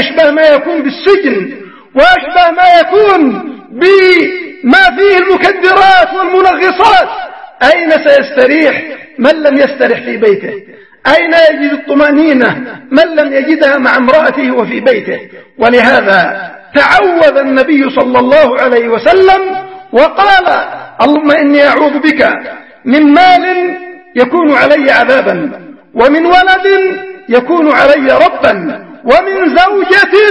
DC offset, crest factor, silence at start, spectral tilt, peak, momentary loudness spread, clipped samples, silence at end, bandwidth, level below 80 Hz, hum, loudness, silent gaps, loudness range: 0.4%; 8 dB; 0 s; -5 dB/octave; 0 dBFS; 11 LU; 2%; 0 s; 11 kHz; -42 dBFS; none; -7 LUFS; none; 2 LU